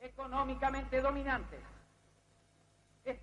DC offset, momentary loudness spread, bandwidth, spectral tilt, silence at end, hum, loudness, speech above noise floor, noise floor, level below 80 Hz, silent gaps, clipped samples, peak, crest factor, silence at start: under 0.1%; 17 LU; 10.5 kHz; -6 dB/octave; 0 s; none; -36 LUFS; 33 dB; -69 dBFS; -50 dBFS; none; under 0.1%; -20 dBFS; 18 dB; 0 s